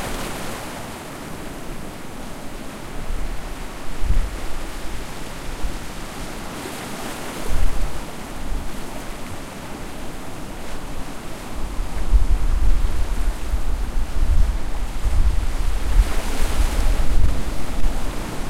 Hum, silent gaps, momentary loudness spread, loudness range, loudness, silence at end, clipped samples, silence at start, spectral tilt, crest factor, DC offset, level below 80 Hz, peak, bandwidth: none; none; 11 LU; 8 LU; -28 LUFS; 0 s; under 0.1%; 0 s; -5 dB/octave; 16 dB; under 0.1%; -22 dBFS; -2 dBFS; 15 kHz